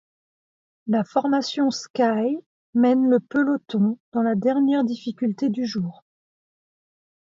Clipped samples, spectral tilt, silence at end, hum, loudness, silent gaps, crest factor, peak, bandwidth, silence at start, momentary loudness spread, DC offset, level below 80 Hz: under 0.1%; -6.5 dB/octave; 1.35 s; none; -22 LUFS; 1.90-1.94 s, 2.46-2.73 s, 4.00-4.12 s; 16 dB; -8 dBFS; 7.6 kHz; 0.85 s; 8 LU; under 0.1%; -70 dBFS